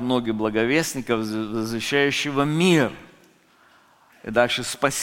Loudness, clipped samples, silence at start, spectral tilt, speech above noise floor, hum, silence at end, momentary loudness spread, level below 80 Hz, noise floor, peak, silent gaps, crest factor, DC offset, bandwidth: -22 LUFS; under 0.1%; 0 s; -4.5 dB/octave; 34 dB; none; 0 s; 8 LU; -54 dBFS; -56 dBFS; -2 dBFS; none; 20 dB; under 0.1%; 17 kHz